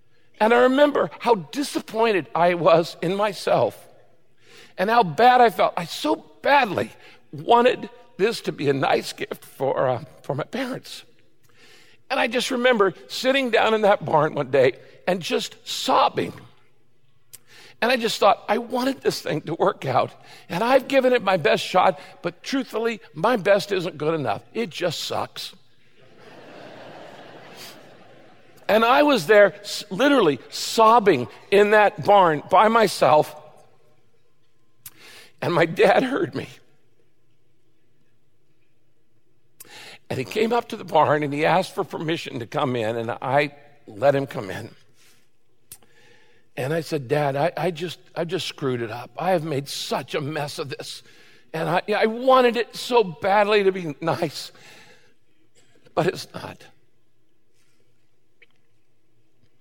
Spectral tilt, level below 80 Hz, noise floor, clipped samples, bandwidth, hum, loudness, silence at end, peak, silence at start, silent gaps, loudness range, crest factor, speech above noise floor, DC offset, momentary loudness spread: -5 dB/octave; -68 dBFS; -69 dBFS; under 0.1%; 17 kHz; none; -21 LUFS; 3.05 s; -4 dBFS; 0.4 s; none; 11 LU; 18 dB; 48 dB; 0.3%; 16 LU